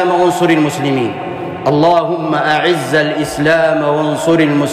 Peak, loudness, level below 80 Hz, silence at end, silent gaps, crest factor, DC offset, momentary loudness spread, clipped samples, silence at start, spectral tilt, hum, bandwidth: -2 dBFS; -13 LUFS; -48 dBFS; 0 s; none; 10 dB; under 0.1%; 6 LU; under 0.1%; 0 s; -5.5 dB/octave; none; 15.5 kHz